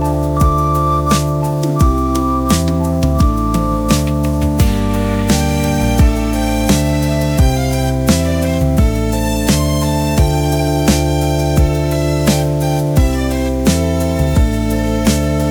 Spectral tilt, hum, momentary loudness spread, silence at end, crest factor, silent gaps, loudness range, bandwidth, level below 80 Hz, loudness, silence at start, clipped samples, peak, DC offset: -6 dB/octave; none; 3 LU; 0 s; 14 dB; none; 1 LU; over 20 kHz; -18 dBFS; -15 LUFS; 0 s; under 0.1%; 0 dBFS; under 0.1%